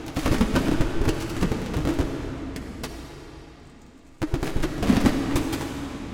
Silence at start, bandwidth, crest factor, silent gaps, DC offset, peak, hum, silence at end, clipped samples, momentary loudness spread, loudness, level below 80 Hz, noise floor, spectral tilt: 0 s; 17 kHz; 20 dB; none; under 0.1%; -6 dBFS; none; 0 s; under 0.1%; 17 LU; -26 LUFS; -32 dBFS; -48 dBFS; -6 dB/octave